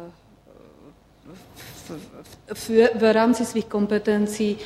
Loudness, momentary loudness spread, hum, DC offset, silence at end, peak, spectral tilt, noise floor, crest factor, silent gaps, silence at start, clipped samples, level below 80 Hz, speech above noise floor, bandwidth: -21 LUFS; 23 LU; none; under 0.1%; 0 s; -4 dBFS; -5.5 dB/octave; -51 dBFS; 18 dB; none; 0 s; under 0.1%; -56 dBFS; 29 dB; 15.5 kHz